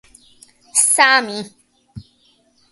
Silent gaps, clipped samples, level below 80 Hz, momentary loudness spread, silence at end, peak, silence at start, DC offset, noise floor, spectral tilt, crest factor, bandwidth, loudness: none; under 0.1%; -58 dBFS; 19 LU; 0.7 s; 0 dBFS; 0.75 s; under 0.1%; -58 dBFS; 0 dB/octave; 20 dB; 16 kHz; -14 LUFS